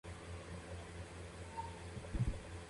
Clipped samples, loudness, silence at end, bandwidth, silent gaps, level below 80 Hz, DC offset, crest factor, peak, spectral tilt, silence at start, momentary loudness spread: under 0.1%; -47 LUFS; 0 s; 11.5 kHz; none; -50 dBFS; under 0.1%; 18 dB; -26 dBFS; -6 dB/octave; 0.05 s; 9 LU